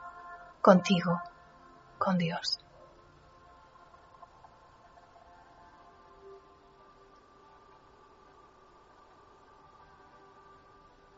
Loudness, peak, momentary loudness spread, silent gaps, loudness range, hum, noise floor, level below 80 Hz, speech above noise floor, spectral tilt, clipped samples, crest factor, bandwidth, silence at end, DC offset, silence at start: -28 LUFS; -8 dBFS; 32 LU; none; 28 LU; none; -59 dBFS; -68 dBFS; 33 dB; -5 dB/octave; under 0.1%; 28 dB; 7.6 kHz; 4.8 s; under 0.1%; 0 s